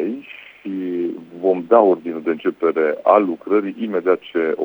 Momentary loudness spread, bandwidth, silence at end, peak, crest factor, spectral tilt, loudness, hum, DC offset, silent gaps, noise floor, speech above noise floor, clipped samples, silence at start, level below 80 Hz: 13 LU; over 20 kHz; 0 s; 0 dBFS; 18 dB; -8.5 dB/octave; -19 LUFS; none; under 0.1%; none; -38 dBFS; 21 dB; under 0.1%; 0 s; -72 dBFS